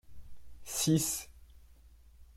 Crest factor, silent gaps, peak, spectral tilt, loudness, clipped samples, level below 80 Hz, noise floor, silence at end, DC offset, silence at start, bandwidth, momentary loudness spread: 20 dB; none; -16 dBFS; -4 dB/octave; -32 LUFS; under 0.1%; -56 dBFS; -58 dBFS; 0 s; under 0.1%; 0.05 s; 16.5 kHz; 24 LU